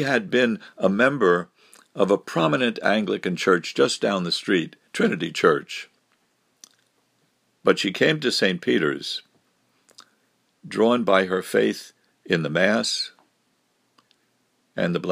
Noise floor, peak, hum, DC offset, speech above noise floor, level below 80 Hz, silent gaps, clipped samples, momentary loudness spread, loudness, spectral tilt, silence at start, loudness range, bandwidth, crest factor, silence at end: -68 dBFS; 0 dBFS; none; under 0.1%; 47 dB; -72 dBFS; none; under 0.1%; 10 LU; -22 LUFS; -4.5 dB/octave; 0 s; 4 LU; 15.5 kHz; 22 dB; 0 s